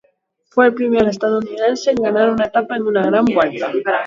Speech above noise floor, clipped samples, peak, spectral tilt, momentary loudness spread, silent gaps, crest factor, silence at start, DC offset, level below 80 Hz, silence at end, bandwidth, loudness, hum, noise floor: 46 dB; under 0.1%; 0 dBFS; -5.5 dB/octave; 5 LU; none; 16 dB; 0.55 s; under 0.1%; -54 dBFS; 0 s; 7.6 kHz; -16 LUFS; none; -62 dBFS